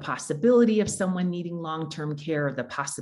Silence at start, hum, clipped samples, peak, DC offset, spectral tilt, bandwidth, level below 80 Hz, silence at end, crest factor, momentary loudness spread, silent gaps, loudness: 0 s; none; under 0.1%; -10 dBFS; under 0.1%; -5.5 dB/octave; 12 kHz; -62 dBFS; 0 s; 16 dB; 12 LU; none; -26 LUFS